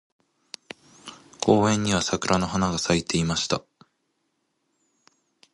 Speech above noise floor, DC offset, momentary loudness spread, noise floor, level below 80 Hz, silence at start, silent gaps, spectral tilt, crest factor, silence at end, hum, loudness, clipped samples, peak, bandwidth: 52 dB; under 0.1%; 23 LU; -74 dBFS; -50 dBFS; 1.05 s; none; -4.5 dB/octave; 24 dB; 1.95 s; none; -23 LUFS; under 0.1%; -4 dBFS; 11.5 kHz